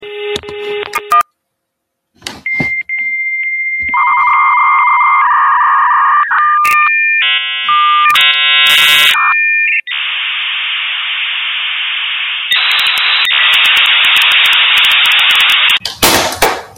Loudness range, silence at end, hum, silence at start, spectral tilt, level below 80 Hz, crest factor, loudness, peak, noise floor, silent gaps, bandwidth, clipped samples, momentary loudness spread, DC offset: 8 LU; 0.1 s; none; 0 s; 0 dB/octave; -46 dBFS; 10 dB; -8 LUFS; 0 dBFS; -72 dBFS; none; over 20 kHz; under 0.1%; 9 LU; under 0.1%